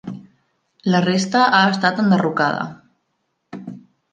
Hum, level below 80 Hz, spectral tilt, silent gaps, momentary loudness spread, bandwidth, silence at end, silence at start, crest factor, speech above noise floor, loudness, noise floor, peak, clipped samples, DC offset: none; -66 dBFS; -5.5 dB/octave; none; 22 LU; 9.2 kHz; 0.35 s; 0.05 s; 18 dB; 55 dB; -17 LUFS; -71 dBFS; -2 dBFS; under 0.1%; under 0.1%